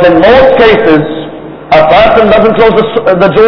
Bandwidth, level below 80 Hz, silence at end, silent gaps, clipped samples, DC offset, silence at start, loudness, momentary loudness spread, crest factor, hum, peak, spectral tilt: 5.4 kHz; -30 dBFS; 0 s; none; 10%; under 0.1%; 0 s; -5 LUFS; 13 LU; 4 dB; none; 0 dBFS; -7.5 dB/octave